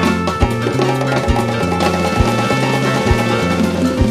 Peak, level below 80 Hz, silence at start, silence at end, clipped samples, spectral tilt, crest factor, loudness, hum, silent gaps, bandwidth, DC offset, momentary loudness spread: 0 dBFS; -26 dBFS; 0 s; 0 s; under 0.1%; -6 dB/octave; 14 dB; -15 LUFS; none; none; 15 kHz; under 0.1%; 2 LU